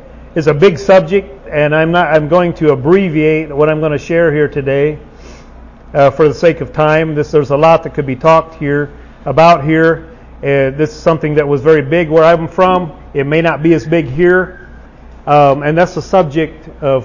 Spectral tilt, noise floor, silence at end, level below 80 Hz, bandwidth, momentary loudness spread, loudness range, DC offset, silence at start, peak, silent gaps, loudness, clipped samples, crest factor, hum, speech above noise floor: -7.5 dB/octave; -35 dBFS; 0 s; -36 dBFS; 7.4 kHz; 9 LU; 2 LU; under 0.1%; 0.15 s; 0 dBFS; none; -11 LUFS; under 0.1%; 12 dB; none; 24 dB